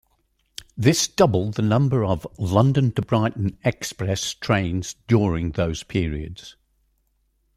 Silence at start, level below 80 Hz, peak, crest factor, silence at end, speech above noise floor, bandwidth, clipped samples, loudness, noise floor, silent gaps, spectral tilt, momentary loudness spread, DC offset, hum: 0.75 s; -44 dBFS; -2 dBFS; 20 dB; 1.05 s; 46 dB; 15.5 kHz; under 0.1%; -22 LUFS; -68 dBFS; none; -5.5 dB/octave; 10 LU; under 0.1%; none